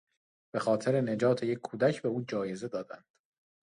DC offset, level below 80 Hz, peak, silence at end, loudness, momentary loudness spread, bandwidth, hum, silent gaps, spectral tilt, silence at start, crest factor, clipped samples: under 0.1%; -74 dBFS; -14 dBFS; 0.65 s; -31 LUFS; 11 LU; 11 kHz; none; none; -6.5 dB/octave; 0.55 s; 18 dB; under 0.1%